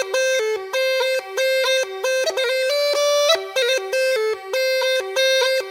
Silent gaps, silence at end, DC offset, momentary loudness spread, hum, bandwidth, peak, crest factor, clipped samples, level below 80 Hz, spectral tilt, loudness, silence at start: none; 0 s; under 0.1%; 5 LU; none; 17 kHz; -4 dBFS; 16 dB; under 0.1%; -78 dBFS; 1.5 dB/octave; -19 LUFS; 0 s